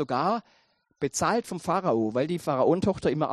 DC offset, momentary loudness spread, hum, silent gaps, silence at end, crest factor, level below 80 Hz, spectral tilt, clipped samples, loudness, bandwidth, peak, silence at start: under 0.1%; 6 LU; none; none; 0 s; 16 dB; -58 dBFS; -5.5 dB/octave; under 0.1%; -27 LUFS; 13 kHz; -10 dBFS; 0 s